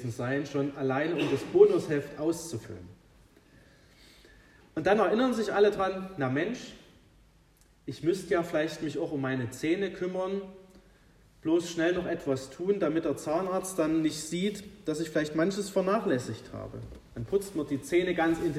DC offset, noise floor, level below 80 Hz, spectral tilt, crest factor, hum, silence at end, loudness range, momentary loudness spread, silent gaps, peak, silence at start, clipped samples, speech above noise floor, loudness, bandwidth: under 0.1%; -62 dBFS; -60 dBFS; -5.5 dB/octave; 22 dB; none; 0 s; 4 LU; 15 LU; none; -8 dBFS; 0 s; under 0.1%; 33 dB; -29 LUFS; 15 kHz